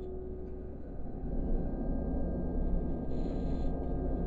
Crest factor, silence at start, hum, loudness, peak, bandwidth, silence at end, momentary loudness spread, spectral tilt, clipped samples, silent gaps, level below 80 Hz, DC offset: 12 dB; 0 s; none; -38 LUFS; -20 dBFS; 4.4 kHz; 0 s; 8 LU; -11 dB/octave; under 0.1%; none; -36 dBFS; 0.3%